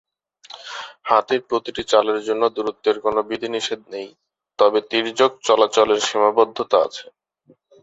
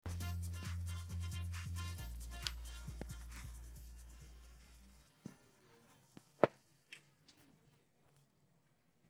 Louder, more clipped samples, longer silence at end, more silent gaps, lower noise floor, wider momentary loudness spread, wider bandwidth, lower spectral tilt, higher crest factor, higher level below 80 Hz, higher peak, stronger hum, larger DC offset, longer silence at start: first, -19 LUFS vs -44 LUFS; neither; about the same, 0.8 s vs 0.9 s; neither; second, -57 dBFS vs -76 dBFS; second, 16 LU vs 24 LU; second, 8 kHz vs 16.5 kHz; second, -2.5 dB/octave vs -5 dB/octave; second, 18 dB vs 36 dB; second, -62 dBFS vs -54 dBFS; first, -2 dBFS vs -10 dBFS; neither; neither; first, 0.55 s vs 0.05 s